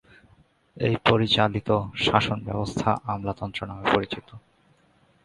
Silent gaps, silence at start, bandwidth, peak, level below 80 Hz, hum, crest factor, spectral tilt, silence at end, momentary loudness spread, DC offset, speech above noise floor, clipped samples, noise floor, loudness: none; 0.75 s; 11.5 kHz; -2 dBFS; -50 dBFS; none; 24 dB; -6 dB/octave; 0.85 s; 10 LU; under 0.1%; 37 dB; under 0.1%; -62 dBFS; -24 LUFS